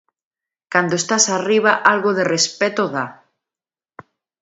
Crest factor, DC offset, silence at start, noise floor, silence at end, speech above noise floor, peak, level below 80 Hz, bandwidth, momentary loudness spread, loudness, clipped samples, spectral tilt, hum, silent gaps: 20 dB; under 0.1%; 0.7 s; under -90 dBFS; 1.3 s; over 73 dB; 0 dBFS; -70 dBFS; 8 kHz; 7 LU; -17 LUFS; under 0.1%; -2.5 dB/octave; none; none